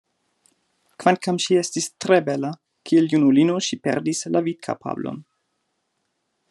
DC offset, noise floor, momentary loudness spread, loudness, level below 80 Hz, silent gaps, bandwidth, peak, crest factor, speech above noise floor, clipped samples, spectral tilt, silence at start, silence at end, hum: under 0.1%; -74 dBFS; 13 LU; -21 LUFS; -72 dBFS; none; 12 kHz; -2 dBFS; 22 dB; 53 dB; under 0.1%; -5 dB/octave; 1 s; 1.3 s; none